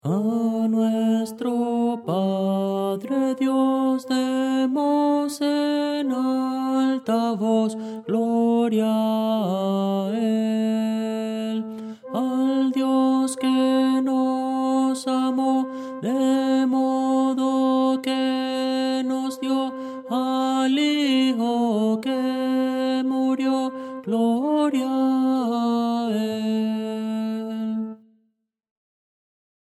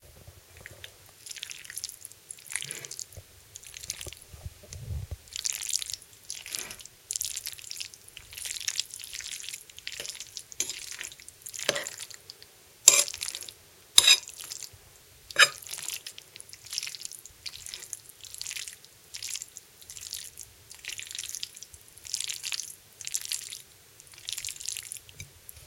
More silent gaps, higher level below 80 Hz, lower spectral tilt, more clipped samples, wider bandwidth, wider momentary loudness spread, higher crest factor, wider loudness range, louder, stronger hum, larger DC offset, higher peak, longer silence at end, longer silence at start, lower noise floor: neither; second, -78 dBFS vs -58 dBFS; first, -6 dB/octave vs 1 dB/octave; neither; second, 13 kHz vs 17 kHz; second, 6 LU vs 24 LU; second, 12 dB vs 34 dB; second, 2 LU vs 15 LU; first, -23 LUFS vs -29 LUFS; neither; neither; second, -10 dBFS vs 0 dBFS; first, 1.8 s vs 0 s; about the same, 0.05 s vs 0.05 s; first, -72 dBFS vs -55 dBFS